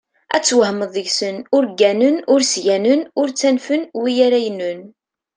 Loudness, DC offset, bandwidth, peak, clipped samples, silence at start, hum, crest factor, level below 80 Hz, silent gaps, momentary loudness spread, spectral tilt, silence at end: -17 LUFS; under 0.1%; 10 kHz; -2 dBFS; under 0.1%; 0.3 s; none; 16 dB; -68 dBFS; none; 7 LU; -3 dB/octave; 0.5 s